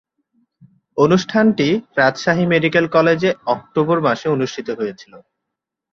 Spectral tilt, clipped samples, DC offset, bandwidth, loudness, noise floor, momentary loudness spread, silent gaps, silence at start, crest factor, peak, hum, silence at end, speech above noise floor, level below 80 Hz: -6 dB/octave; under 0.1%; under 0.1%; 7.4 kHz; -17 LUFS; -81 dBFS; 9 LU; none; 0.95 s; 18 dB; 0 dBFS; none; 0.75 s; 64 dB; -58 dBFS